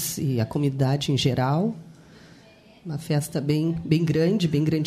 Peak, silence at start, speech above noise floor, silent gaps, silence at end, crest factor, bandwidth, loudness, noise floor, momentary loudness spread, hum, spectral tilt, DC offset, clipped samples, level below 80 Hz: -8 dBFS; 0 s; 29 dB; none; 0 s; 16 dB; 15 kHz; -24 LUFS; -51 dBFS; 9 LU; none; -6 dB/octave; under 0.1%; under 0.1%; -54 dBFS